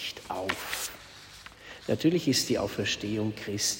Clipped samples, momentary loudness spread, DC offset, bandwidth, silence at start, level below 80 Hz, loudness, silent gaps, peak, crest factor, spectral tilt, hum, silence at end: under 0.1%; 20 LU; under 0.1%; 16.5 kHz; 0 s; -58 dBFS; -29 LUFS; none; -12 dBFS; 20 dB; -3.5 dB/octave; 50 Hz at -60 dBFS; 0 s